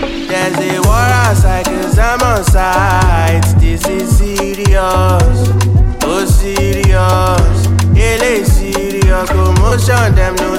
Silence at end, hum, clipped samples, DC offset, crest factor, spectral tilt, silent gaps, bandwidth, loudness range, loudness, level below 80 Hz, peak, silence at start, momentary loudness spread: 0 s; none; under 0.1%; under 0.1%; 10 dB; -5.5 dB/octave; none; 16.5 kHz; 1 LU; -11 LUFS; -14 dBFS; 0 dBFS; 0 s; 4 LU